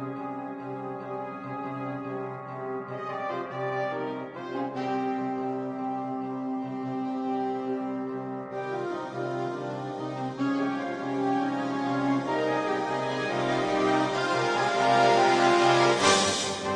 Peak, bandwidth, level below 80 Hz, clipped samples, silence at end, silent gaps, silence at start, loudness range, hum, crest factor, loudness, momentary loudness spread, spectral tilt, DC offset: -8 dBFS; 10.5 kHz; -68 dBFS; under 0.1%; 0 s; none; 0 s; 10 LU; none; 20 dB; -28 LUFS; 14 LU; -4 dB/octave; under 0.1%